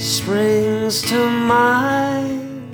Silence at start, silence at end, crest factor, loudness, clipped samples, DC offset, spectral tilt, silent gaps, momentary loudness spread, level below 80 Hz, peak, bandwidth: 0 s; 0 s; 16 dB; -17 LUFS; under 0.1%; under 0.1%; -4 dB/octave; none; 8 LU; -52 dBFS; -2 dBFS; over 20 kHz